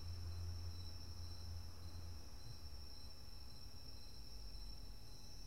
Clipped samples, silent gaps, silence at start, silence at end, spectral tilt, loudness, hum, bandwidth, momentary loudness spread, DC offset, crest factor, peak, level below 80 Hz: under 0.1%; none; 0 s; 0 s; -4.5 dB/octave; -54 LUFS; none; 16 kHz; 7 LU; 0.3%; 14 dB; -38 dBFS; -56 dBFS